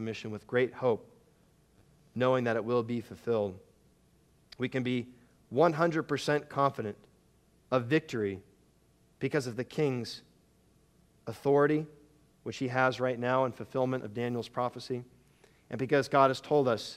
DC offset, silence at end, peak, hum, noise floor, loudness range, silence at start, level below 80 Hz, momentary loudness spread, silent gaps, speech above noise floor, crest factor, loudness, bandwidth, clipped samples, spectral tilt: under 0.1%; 0 s; -10 dBFS; none; -66 dBFS; 3 LU; 0 s; -70 dBFS; 14 LU; none; 36 dB; 22 dB; -31 LUFS; 14 kHz; under 0.1%; -6.5 dB/octave